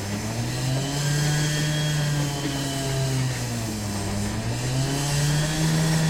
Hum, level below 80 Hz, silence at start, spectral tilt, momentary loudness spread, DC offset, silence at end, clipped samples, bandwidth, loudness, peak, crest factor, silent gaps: none; -40 dBFS; 0 s; -4.5 dB/octave; 5 LU; under 0.1%; 0 s; under 0.1%; 16.5 kHz; -25 LUFS; -10 dBFS; 14 dB; none